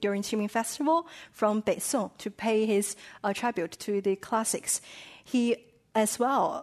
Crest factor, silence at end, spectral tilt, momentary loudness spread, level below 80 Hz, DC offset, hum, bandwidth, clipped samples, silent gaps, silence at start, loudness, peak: 16 dB; 0 s; -3.5 dB/octave; 8 LU; -70 dBFS; under 0.1%; none; 13.5 kHz; under 0.1%; none; 0 s; -29 LUFS; -12 dBFS